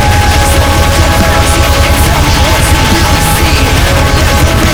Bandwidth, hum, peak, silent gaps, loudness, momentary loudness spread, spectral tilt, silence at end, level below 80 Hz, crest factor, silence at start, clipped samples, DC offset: over 20 kHz; none; 0 dBFS; none; -7 LUFS; 1 LU; -4 dB/octave; 0 s; -12 dBFS; 6 dB; 0 s; 1%; 1%